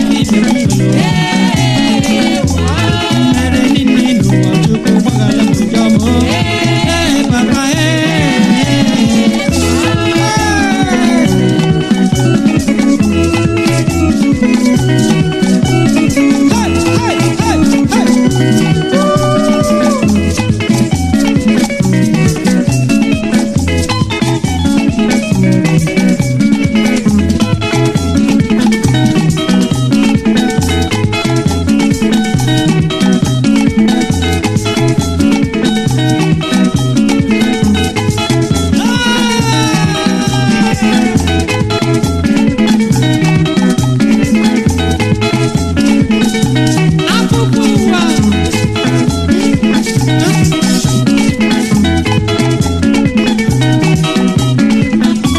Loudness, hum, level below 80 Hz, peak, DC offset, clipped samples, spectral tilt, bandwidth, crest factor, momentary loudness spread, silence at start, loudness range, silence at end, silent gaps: -11 LUFS; none; -30 dBFS; 0 dBFS; under 0.1%; 0.1%; -5.5 dB/octave; 14 kHz; 10 dB; 2 LU; 0 s; 1 LU; 0 s; none